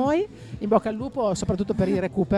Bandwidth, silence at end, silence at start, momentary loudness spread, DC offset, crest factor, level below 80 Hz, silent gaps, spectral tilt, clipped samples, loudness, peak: 11.5 kHz; 0 s; 0 s; 7 LU; under 0.1%; 18 dB; -44 dBFS; none; -7 dB/octave; under 0.1%; -25 LUFS; -6 dBFS